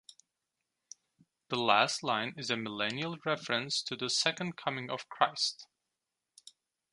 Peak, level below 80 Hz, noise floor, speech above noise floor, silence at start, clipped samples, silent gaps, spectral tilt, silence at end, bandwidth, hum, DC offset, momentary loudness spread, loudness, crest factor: -10 dBFS; -80 dBFS; -88 dBFS; 55 dB; 1.5 s; under 0.1%; none; -2.5 dB/octave; 1.3 s; 11.5 kHz; none; under 0.1%; 9 LU; -32 LUFS; 26 dB